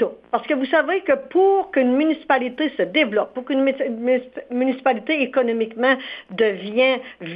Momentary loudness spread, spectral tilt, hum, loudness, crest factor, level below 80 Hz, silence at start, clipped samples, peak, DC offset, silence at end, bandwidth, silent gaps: 6 LU; -8 dB/octave; none; -20 LUFS; 18 dB; -66 dBFS; 0 s; under 0.1%; -4 dBFS; under 0.1%; 0 s; 5.2 kHz; none